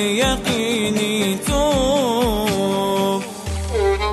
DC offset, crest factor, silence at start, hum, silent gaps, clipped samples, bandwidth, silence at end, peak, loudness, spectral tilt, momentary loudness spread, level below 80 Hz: under 0.1%; 12 dB; 0 s; none; none; under 0.1%; 13 kHz; 0 s; -6 dBFS; -19 LUFS; -4.5 dB/octave; 5 LU; -32 dBFS